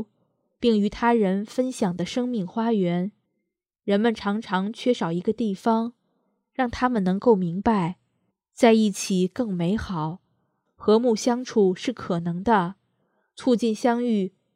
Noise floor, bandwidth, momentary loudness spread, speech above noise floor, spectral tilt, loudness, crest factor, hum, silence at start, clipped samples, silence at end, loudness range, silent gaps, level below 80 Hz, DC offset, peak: -80 dBFS; 14 kHz; 9 LU; 57 dB; -6 dB/octave; -24 LUFS; 20 dB; none; 0 s; under 0.1%; 0.25 s; 3 LU; none; -54 dBFS; under 0.1%; -2 dBFS